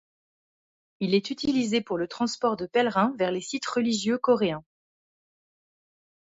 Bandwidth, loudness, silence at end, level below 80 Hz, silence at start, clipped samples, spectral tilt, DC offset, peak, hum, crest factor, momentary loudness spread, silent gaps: 8 kHz; -26 LUFS; 1.6 s; -66 dBFS; 1 s; under 0.1%; -4.5 dB/octave; under 0.1%; -10 dBFS; none; 18 dB; 6 LU; none